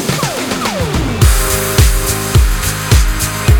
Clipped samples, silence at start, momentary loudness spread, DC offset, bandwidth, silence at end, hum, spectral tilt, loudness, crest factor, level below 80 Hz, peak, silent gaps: under 0.1%; 0 s; 5 LU; under 0.1%; over 20 kHz; 0 s; none; -4 dB/octave; -13 LUFS; 12 dB; -16 dBFS; 0 dBFS; none